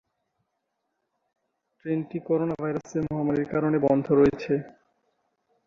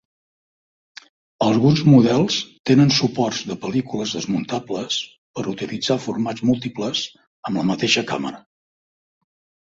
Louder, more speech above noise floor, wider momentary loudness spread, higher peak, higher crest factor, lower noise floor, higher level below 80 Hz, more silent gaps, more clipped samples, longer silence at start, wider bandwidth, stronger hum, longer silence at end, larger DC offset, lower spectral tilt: second, -25 LUFS vs -20 LUFS; second, 55 dB vs over 71 dB; second, 9 LU vs 13 LU; second, -8 dBFS vs -2 dBFS; about the same, 20 dB vs 18 dB; second, -79 dBFS vs under -90 dBFS; about the same, -56 dBFS vs -56 dBFS; second, none vs 2.59-2.64 s, 5.18-5.34 s, 7.27-7.43 s; neither; first, 1.85 s vs 1.4 s; about the same, 7.4 kHz vs 7.8 kHz; neither; second, 0.95 s vs 1.35 s; neither; first, -8.5 dB/octave vs -5.5 dB/octave